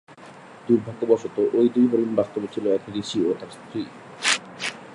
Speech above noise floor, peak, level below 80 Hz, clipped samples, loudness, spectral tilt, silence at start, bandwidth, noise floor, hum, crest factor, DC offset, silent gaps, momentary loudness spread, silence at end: 22 dB; -2 dBFS; -66 dBFS; under 0.1%; -23 LUFS; -4 dB/octave; 0.1 s; 11.5 kHz; -44 dBFS; none; 22 dB; under 0.1%; none; 13 LU; 0 s